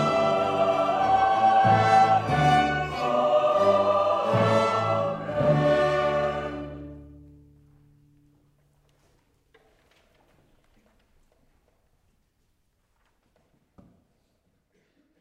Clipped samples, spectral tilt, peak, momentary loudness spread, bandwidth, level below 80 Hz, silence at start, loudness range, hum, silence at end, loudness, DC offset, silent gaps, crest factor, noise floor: under 0.1%; -6 dB/octave; -8 dBFS; 9 LU; 11 kHz; -54 dBFS; 0 s; 11 LU; none; 8.15 s; -22 LUFS; under 0.1%; none; 18 dB; -70 dBFS